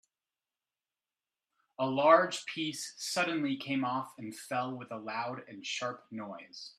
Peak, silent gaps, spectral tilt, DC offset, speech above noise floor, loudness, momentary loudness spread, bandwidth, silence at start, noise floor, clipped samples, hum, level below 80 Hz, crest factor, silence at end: -8 dBFS; none; -4 dB/octave; under 0.1%; over 57 dB; -32 LUFS; 18 LU; 14 kHz; 1.8 s; under -90 dBFS; under 0.1%; none; -84 dBFS; 26 dB; 0.05 s